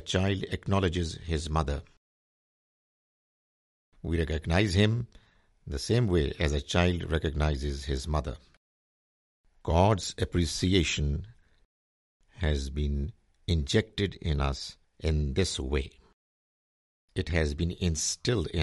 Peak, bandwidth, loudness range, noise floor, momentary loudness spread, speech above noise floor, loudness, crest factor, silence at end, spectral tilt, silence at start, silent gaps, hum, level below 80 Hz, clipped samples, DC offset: -8 dBFS; 11.5 kHz; 5 LU; under -90 dBFS; 11 LU; over 62 dB; -29 LUFS; 22 dB; 0 s; -5 dB/octave; 0 s; 1.97-3.92 s, 8.57-9.44 s, 11.65-12.20 s, 16.13-17.08 s; none; -40 dBFS; under 0.1%; under 0.1%